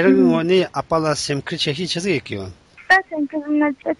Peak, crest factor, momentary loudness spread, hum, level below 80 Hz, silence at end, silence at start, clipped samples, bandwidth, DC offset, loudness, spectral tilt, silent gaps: -2 dBFS; 16 dB; 9 LU; none; -52 dBFS; 0.05 s; 0 s; under 0.1%; 11.5 kHz; under 0.1%; -19 LUFS; -5 dB/octave; none